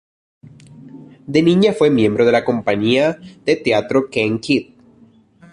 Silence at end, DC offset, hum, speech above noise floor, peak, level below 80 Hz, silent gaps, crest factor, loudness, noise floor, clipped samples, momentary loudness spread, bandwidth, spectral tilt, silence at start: 0.9 s; under 0.1%; none; 34 dB; -2 dBFS; -54 dBFS; none; 14 dB; -16 LUFS; -50 dBFS; under 0.1%; 6 LU; 11 kHz; -6.5 dB/octave; 0.85 s